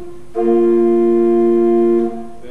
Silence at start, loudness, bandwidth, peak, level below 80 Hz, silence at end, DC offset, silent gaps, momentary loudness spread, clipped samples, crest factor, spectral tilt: 0 s; -14 LUFS; 3.3 kHz; -4 dBFS; -50 dBFS; 0 s; 4%; none; 10 LU; under 0.1%; 10 dB; -8.5 dB/octave